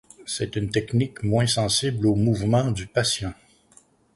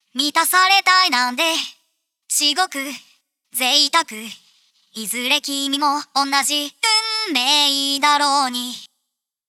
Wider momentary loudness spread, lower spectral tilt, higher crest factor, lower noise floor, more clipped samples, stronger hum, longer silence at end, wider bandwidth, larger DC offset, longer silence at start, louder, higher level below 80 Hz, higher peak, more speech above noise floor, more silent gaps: second, 7 LU vs 16 LU; first, -5 dB/octave vs 1 dB/octave; about the same, 16 dB vs 20 dB; second, -57 dBFS vs -78 dBFS; neither; neither; first, 0.85 s vs 0.65 s; second, 11.5 kHz vs 18.5 kHz; neither; about the same, 0.2 s vs 0.15 s; second, -23 LUFS vs -17 LUFS; first, -46 dBFS vs -76 dBFS; second, -8 dBFS vs 0 dBFS; second, 34 dB vs 60 dB; neither